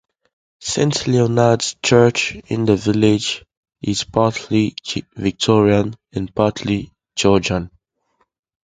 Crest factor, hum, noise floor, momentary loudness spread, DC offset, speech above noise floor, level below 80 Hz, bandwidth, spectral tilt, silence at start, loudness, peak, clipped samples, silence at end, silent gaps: 18 dB; none; -66 dBFS; 12 LU; under 0.1%; 49 dB; -44 dBFS; 9.6 kHz; -5 dB/octave; 0.6 s; -18 LUFS; 0 dBFS; under 0.1%; 1 s; 3.57-3.63 s